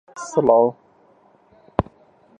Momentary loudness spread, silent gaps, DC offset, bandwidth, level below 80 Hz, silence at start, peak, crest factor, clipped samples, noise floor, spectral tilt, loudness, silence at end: 11 LU; none; under 0.1%; 9.6 kHz; -46 dBFS; 0.15 s; 0 dBFS; 22 dB; under 0.1%; -55 dBFS; -7 dB/octave; -20 LUFS; 0.6 s